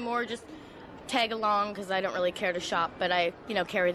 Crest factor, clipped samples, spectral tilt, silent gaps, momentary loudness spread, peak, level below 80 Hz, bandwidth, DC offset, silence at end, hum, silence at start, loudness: 16 dB; under 0.1%; -3.5 dB/octave; none; 15 LU; -14 dBFS; -62 dBFS; 13.5 kHz; under 0.1%; 0 s; none; 0 s; -29 LUFS